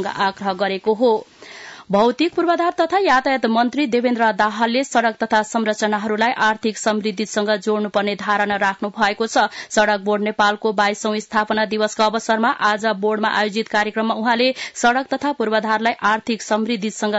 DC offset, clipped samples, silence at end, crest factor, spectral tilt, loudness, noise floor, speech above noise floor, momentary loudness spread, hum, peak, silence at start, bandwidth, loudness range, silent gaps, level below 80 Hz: under 0.1%; under 0.1%; 0 s; 14 dB; -4 dB/octave; -19 LUFS; -38 dBFS; 20 dB; 4 LU; none; -4 dBFS; 0 s; 8 kHz; 2 LU; none; -60 dBFS